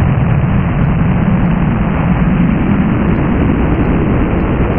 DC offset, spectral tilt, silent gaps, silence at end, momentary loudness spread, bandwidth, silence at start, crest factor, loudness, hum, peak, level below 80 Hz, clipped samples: under 0.1%; -12.5 dB/octave; none; 0 s; 1 LU; 3.4 kHz; 0 s; 10 dB; -13 LUFS; none; 0 dBFS; -20 dBFS; under 0.1%